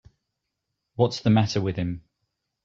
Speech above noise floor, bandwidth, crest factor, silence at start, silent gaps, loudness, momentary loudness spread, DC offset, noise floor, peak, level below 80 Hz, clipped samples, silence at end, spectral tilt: 59 dB; 7.6 kHz; 20 dB; 1 s; none; -24 LUFS; 16 LU; under 0.1%; -82 dBFS; -6 dBFS; -56 dBFS; under 0.1%; 0.65 s; -7 dB/octave